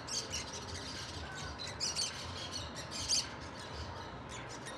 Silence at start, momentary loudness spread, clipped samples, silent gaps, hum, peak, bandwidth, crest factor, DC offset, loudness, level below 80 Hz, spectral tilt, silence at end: 0 s; 12 LU; under 0.1%; none; none; -20 dBFS; 15 kHz; 20 dB; under 0.1%; -39 LUFS; -58 dBFS; -2 dB/octave; 0 s